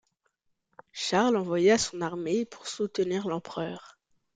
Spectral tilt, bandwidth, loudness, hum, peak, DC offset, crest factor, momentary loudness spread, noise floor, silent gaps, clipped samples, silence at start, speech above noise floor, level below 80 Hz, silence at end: -4 dB/octave; 9.6 kHz; -28 LUFS; none; -10 dBFS; under 0.1%; 18 dB; 13 LU; -76 dBFS; none; under 0.1%; 0.95 s; 48 dB; -66 dBFS; 0.45 s